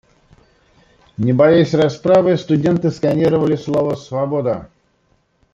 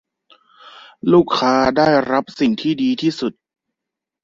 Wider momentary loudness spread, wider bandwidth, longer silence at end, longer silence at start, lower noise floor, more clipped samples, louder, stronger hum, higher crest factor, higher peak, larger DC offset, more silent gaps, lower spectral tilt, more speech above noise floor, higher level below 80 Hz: about the same, 10 LU vs 9 LU; about the same, 7.6 kHz vs 7.6 kHz; about the same, 0.9 s vs 0.95 s; first, 1.2 s vs 0.65 s; second, -61 dBFS vs -84 dBFS; neither; about the same, -16 LUFS vs -17 LUFS; neither; about the same, 16 dB vs 16 dB; about the same, 0 dBFS vs -2 dBFS; neither; neither; first, -8 dB/octave vs -6 dB/octave; second, 46 dB vs 68 dB; about the same, -52 dBFS vs -52 dBFS